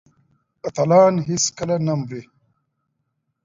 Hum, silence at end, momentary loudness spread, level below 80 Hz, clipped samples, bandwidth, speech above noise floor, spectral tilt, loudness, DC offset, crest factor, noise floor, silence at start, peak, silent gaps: none; 1.25 s; 18 LU; -58 dBFS; under 0.1%; 7.8 kHz; 56 dB; -5 dB/octave; -19 LUFS; under 0.1%; 18 dB; -74 dBFS; 0.65 s; -4 dBFS; none